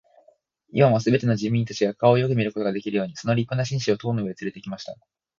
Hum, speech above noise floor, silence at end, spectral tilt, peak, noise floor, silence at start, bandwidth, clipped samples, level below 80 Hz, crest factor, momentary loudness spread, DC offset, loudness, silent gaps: none; 38 dB; 0.45 s; -7 dB/octave; -4 dBFS; -60 dBFS; 0.75 s; 7.4 kHz; under 0.1%; -60 dBFS; 20 dB; 14 LU; under 0.1%; -23 LUFS; none